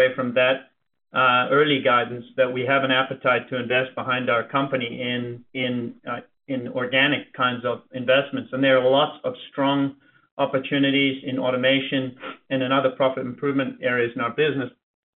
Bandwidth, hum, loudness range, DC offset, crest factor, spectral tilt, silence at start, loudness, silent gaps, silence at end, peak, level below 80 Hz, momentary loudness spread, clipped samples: 4.2 kHz; none; 4 LU; under 0.1%; 16 dB; -2.5 dB/octave; 0 s; -22 LUFS; 10.31-10.37 s; 0.5 s; -6 dBFS; -68 dBFS; 11 LU; under 0.1%